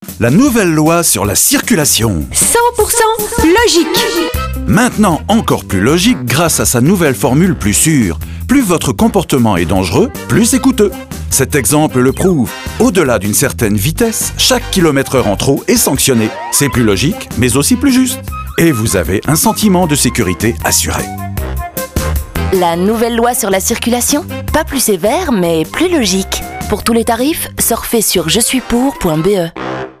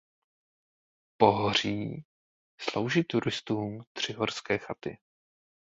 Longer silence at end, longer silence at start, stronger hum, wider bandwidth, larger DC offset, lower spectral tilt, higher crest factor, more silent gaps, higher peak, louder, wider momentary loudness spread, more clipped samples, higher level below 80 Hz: second, 0.1 s vs 0.65 s; second, 0 s vs 1.2 s; neither; first, 15.5 kHz vs 8 kHz; neither; about the same, -4 dB/octave vs -5 dB/octave; second, 12 dB vs 26 dB; second, none vs 2.05-2.58 s, 3.87-3.95 s; first, 0 dBFS vs -6 dBFS; first, -11 LUFS vs -30 LUFS; second, 7 LU vs 14 LU; neither; first, -28 dBFS vs -62 dBFS